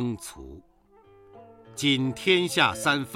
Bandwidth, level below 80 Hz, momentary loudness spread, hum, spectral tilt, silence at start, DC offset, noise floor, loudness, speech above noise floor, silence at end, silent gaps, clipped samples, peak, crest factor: 16.5 kHz; -56 dBFS; 21 LU; none; -4 dB/octave; 0 s; under 0.1%; -56 dBFS; -23 LUFS; 31 dB; 0 s; none; under 0.1%; -6 dBFS; 22 dB